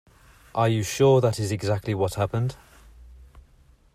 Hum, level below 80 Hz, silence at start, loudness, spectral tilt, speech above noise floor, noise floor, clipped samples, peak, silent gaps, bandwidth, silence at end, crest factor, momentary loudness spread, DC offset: none; -52 dBFS; 0.55 s; -24 LUFS; -6 dB/octave; 34 dB; -56 dBFS; under 0.1%; -8 dBFS; none; 16 kHz; 0.55 s; 18 dB; 9 LU; under 0.1%